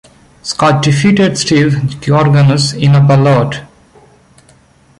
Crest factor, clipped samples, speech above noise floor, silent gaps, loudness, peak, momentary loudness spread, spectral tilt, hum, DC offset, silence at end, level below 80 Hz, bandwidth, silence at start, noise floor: 10 dB; under 0.1%; 37 dB; none; -10 LUFS; 0 dBFS; 10 LU; -6 dB/octave; none; under 0.1%; 1.35 s; -42 dBFS; 11.5 kHz; 0.45 s; -46 dBFS